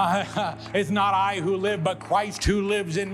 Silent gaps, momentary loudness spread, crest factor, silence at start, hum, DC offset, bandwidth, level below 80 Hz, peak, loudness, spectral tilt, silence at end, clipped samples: none; 5 LU; 14 dB; 0 s; none; under 0.1%; 14 kHz; -40 dBFS; -10 dBFS; -24 LUFS; -5 dB/octave; 0 s; under 0.1%